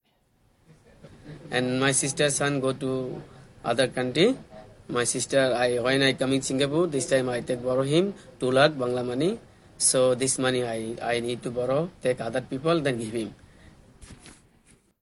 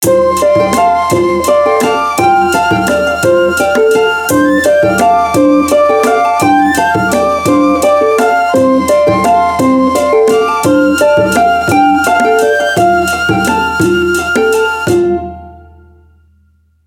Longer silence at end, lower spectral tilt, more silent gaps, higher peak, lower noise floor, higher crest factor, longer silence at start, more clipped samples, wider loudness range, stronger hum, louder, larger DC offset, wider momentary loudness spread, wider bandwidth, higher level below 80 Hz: second, 0.7 s vs 1.3 s; about the same, -4 dB/octave vs -4.5 dB/octave; neither; second, -4 dBFS vs 0 dBFS; first, -66 dBFS vs -51 dBFS; first, 22 dB vs 10 dB; first, 1.05 s vs 0 s; neither; about the same, 4 LU vs 2 LU; neither; second, -25 LUFS vs -9 LUFS; neither; first, 9 LU vs 2 LU; second, 12 kHz vs 18.5 kHz; second, -58 dBFS vs -38 dBFS